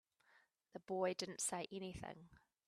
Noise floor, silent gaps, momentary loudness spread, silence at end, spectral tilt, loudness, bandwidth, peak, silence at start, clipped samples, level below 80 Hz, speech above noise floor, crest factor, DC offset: -75 dBFS; none; 17 LU; 0.3 s; -3 dB/octave; -44 LUFS; 13.5 kHz; -26 dBFS; 0.35 s; under 0.1%; -72 dBFS; 31 dB; 20 dB; under 0.1%